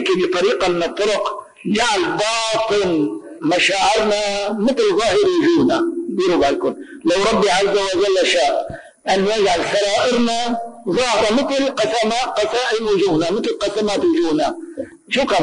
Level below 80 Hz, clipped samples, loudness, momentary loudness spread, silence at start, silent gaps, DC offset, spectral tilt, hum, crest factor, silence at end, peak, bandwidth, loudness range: -48 dBFS; under 0.1%; -17 LUFS; 7 LU; 0 s; none; under 0.1%; -3.5 dB/octave; none; 10 dB; 0 s; -6 dBFS; 10.5 kHz; 2 LU